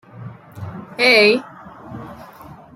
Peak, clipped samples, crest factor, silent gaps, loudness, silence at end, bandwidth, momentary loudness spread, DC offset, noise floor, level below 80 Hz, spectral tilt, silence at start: 0 dBFS; under 0.1%; 20 dB; none; -13 LUFS; 0.6 s; 14 kHz; 26 LU; under 0.1%; -41 dBFS; -58 dBFS; -4 dB/octave; 0.2 s